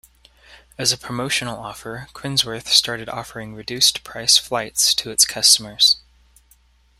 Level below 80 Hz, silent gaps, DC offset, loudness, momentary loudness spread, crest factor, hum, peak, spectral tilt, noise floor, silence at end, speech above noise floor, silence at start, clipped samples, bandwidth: -54 dBFS; none; under 0.1%; -17 LUFS; 18 LU; 22 dB; none; 0 dBFS; -0.5 dB/octave; -56 dBFS; 1 s; 36 dB; 0.5 s; under 0.1%; 16 kHz